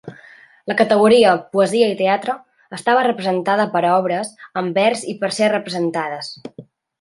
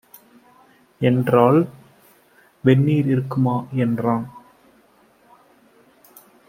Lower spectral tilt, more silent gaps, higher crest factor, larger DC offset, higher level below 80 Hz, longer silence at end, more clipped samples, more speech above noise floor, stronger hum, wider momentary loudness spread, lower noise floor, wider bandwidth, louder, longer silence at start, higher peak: second, -4.5 dB/octave vs -9 dB/octave; neither; about the same, 16 dB vs 20 dB; neither; about the same, -64 dBFS vs -60 dBFS; second, 0.4 s vs 2.1 s; neither; second, 29 dB vs 38 dB; neither; first, 16 LU vs 8 LU; second, -46 dBFS vs -56 dBFS; second, 11.5 kHz vs 15.5 kHz; about the same, -17 LUFS vs -19 LUFS; second, 0.05 s vs 1 s; about the same, -2 dBFS vs -2 dBFS